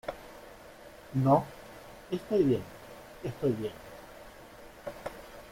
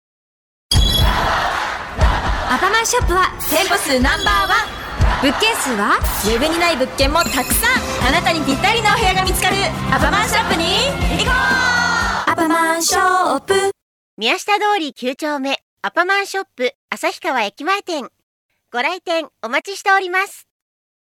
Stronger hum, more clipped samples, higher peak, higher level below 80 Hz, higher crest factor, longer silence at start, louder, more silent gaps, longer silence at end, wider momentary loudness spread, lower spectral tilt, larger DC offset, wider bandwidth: neither; neither; second, -10 dBFS vs -2 dBFS; second, -58 dBFS vs -28 dBFS; first, 22 dB vs 16 dB; second, 0.05 s vs 0.7 s; second, -31 LUFS vs -16 LUFS; second, none vs 13.82-14.17 s, 15.62-15.77 s, 16.75-16.88 s, 18.23-18.49 s; second, 0 s vs 0.75 s; first, 23 LU vs 8 LU; first, -8 dB/octave vs -3 dB/octave; neither; second, 16.5 kHz vs 19 kHz